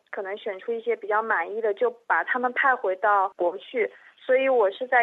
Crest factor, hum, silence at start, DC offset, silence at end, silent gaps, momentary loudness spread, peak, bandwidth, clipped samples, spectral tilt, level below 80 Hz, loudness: 16 dB; none; 0.1 s; under 0.1%; 0 s; none; 9 LU; -8 dBFS; 4.1 kHz; under 0.1%; -5 dB/octave; -90 dBFS; -25 LUFS